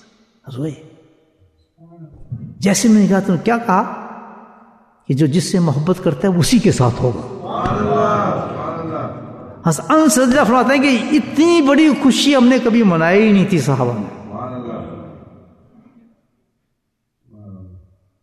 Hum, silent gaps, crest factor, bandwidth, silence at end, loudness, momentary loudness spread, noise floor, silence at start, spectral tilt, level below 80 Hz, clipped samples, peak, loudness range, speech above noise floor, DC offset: none; none; 14 dB; 13.5 kHz; 0.45 s; -15 LUFS; 17 LU; -71 dBFS; 0.45 s; -5.5 dB/octave; -46 dBFS; under 0.1%; -2 dBFS; 7 LU; 58 dB; under 0.1%